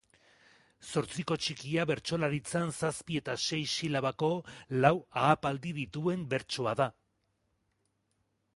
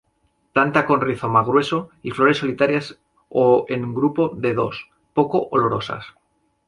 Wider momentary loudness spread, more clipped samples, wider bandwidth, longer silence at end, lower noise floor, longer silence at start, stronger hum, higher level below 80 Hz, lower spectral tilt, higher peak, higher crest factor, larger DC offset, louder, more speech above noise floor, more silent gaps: about the same, 8 LU vs 9 LU; neither; about the same, 11.5 kHz vs 11.5 kHz; first, 1.65 s vs 0.6 s; first, -78 dBFS vs -66 dBFS; first, 0.8 s vs 0.55 s; neither; second, -64 dBFS vs -58 dBFS; second, -5 dB/octave vs -7 dB/octave; second, -8 dBFS vs -2 dBFS; first, 26 dB vs 20 dB; neither; second, -32 LUFS vs -20 LUFS; about the same, 46 dB vs 47 dB; neither